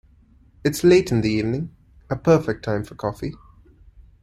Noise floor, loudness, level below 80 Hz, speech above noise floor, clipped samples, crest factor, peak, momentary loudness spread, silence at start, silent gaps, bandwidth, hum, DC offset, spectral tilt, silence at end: -54 dBFS; -21 LUFS; -46 dBFS; 34 dB; under 0.1%; 18 dB; -4 dBFS; 15 LU; 0.65 s; none; 15 kHz; none; under 0.1%; -6.5 dB/octave; 0.85 s